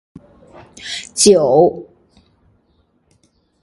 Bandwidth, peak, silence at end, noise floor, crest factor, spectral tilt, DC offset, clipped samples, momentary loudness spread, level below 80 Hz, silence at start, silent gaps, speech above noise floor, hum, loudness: 11.5 kHz; 0 dBFS; 1.8 s; -60 dBFS; 18 dB; -3.5 dB/octave; under 0.1%; under 0.1%; 21 LU; -54 dBFS; 0.85 s; none; 46 dB; none; -13 LUFS